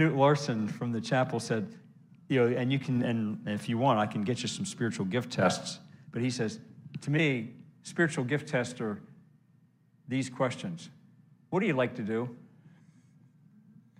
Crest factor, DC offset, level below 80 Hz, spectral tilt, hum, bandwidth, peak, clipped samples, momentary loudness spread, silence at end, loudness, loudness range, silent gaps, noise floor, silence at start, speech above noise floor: 20 dB; under 0.1%; -76 dBFS; -6 dB/octave; none; 12 kHz; -12 dBFS; under 0.1%; 13 LU; 1.55 s; -31 LUFS; 5 LU; none; -64 dBFS; 0 s; 35 dB